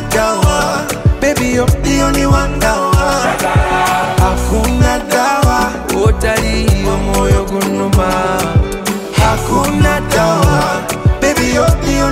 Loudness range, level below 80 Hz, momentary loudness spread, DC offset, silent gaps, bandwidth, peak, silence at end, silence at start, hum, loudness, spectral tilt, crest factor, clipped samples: 1 LU; -18 dBFS; 3 LU; under 0.1%; none; 16.5 kHz; 0 dBFS; 0 s; 0 s; none; -13 LUFS; -5 dB/octave; 12 dB; under 0.1%